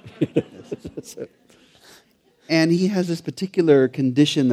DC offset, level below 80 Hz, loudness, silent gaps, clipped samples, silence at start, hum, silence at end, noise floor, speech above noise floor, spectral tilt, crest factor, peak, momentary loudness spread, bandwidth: under 0.1%; -60 dBFS; -20 LUFS; none; under 0.1%; 0.05 s; none; 0 s; -58 dBFS; 38 dB; -6 dB/octave; 18 dB; -2 dBFS; 19 LU; 14.5 kHz